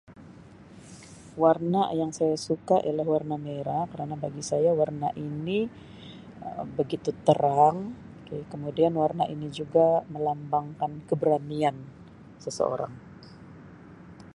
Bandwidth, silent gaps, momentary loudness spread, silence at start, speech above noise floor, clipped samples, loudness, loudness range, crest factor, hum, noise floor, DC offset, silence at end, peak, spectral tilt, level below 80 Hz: 11.5 kHz; none; 23 LU; 0.1 s; 22 dB; under 0.1%; -27 LUFS; 4 LU; 22 dB; none; -49 dBFS; under 0.1%; 0.05 s; -6 dBFS; -6.5 dB/octave; -62 dBFS